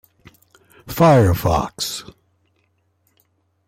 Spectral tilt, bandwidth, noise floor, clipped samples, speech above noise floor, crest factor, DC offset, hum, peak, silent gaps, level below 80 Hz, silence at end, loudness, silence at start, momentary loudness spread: -6 dB/octave; 16.5 kHz; -65 dBFS; under 0.1%; 49 dB; 16 dB; under 0.1%; none; -4 dBFS; none; -40 dBFS; 1.65 s; -17 LUFS; 0.85 s; 17 LU